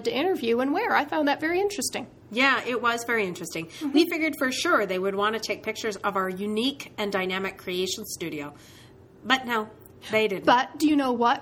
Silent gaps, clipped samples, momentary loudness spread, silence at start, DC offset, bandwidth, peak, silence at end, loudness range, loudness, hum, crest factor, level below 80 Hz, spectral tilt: none; under 0.1%; 11 LU; 0 s; under 0.1%; 19.5 kHz; -4 dBFS; 0 s; 5 LU; -25 LUFS; none; 22 dB; -64 dBFS; -3.5 dB/octave